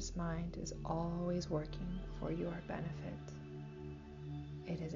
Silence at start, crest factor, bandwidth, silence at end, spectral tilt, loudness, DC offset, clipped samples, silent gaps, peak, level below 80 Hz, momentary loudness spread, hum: 0 s; 14 dB; 7.4 kHz; 0 s; -7 dB/octave; -43 LUFS; under 0.1%; under 0.1%; none; -28 dBFS; -52 dBFS; 11 LU; none